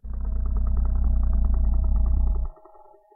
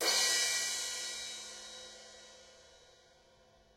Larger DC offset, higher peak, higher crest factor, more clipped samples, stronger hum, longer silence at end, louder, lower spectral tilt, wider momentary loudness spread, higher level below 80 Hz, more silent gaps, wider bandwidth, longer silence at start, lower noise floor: neither; first, -12 dBFS vs -16 dBFS; second, 10 dB vs 22 dB; neither; neither; second, 0.65 s vs 1 s; first, -26 LUFS vs -32 LUFS; first, -13.5 dB/octave vs 2 dB/octave; second, 6 LU vs 24 LU; first, -22 dBFS vs -74 dBFS; neither; second, 1.6 kHz vs 16 kHz; about the same, 0.05 s vs 0 s; second, -50 dBFS vs -65 dBFS